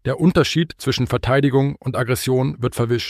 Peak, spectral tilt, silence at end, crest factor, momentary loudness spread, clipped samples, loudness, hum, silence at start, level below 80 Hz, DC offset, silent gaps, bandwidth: -4 dBFS; -6 dB/octave; 0 s; 14 dB; 6 LU; under 0.1%; -19 LUFS; none; 0.05 s; -42 dBFS; under 0.1%; none; 15.5 kHz